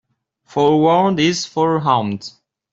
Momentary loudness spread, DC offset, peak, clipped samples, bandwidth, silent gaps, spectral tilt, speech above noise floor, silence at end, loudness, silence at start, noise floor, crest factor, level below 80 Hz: 13 LU; under 0.1%; -2 dBFS; under 0.1%; 7.8 kHz; none; -5.5 dB/octave; 37 dB; 0.45 s; -16 LUFS; 0.55 s; -53 dBFS; 14 dB; -58 dBFS